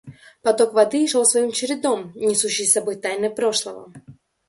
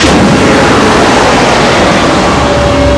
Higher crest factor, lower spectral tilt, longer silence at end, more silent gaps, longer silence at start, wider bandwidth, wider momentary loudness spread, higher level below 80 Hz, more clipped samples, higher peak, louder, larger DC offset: first, 18 dB vs 6 dB; second, -2 dB/octave vs -4.5 dB/octave; first, 0.35 s vs 0 s; neither; about the same, 0.05 s vs 0 s; about the same, 12 kHz vs 11 kHz; first, 8 LU vs 2 LU; second, -66 dBFS vs -20 dBFS; second, under 0.1% vs 3%; about the same, -2 dBFS vs 0 dBFS; second, -19 LUFS vs -6 LUFS; neither